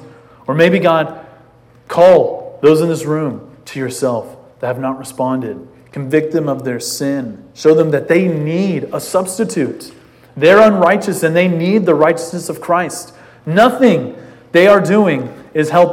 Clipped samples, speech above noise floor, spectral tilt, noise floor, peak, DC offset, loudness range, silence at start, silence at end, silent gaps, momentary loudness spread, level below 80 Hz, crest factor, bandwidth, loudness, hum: 0.2%; 33 dB; -6 dB/octave; -45 dBFS; 0 dBFS; under 0.1%; 7 LU; 0 s; 0 s; none; 15 LU; -56 dBFS; 14 dB; 16.5 kHz; -14 LUFS; none